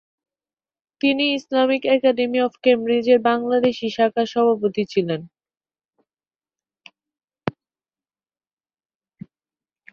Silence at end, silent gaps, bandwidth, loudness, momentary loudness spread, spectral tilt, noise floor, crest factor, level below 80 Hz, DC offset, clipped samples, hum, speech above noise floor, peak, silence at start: 2.4 s; 7.24-7.28 s; 7 kHz; -19 LUFS; 10 LU; -6 dB/octave; under -90 dBFS; 20 dB; -66 dBFS; under 0.1%; under 0.1%; none; over 71 dB; -2 dBFS; 1.05 s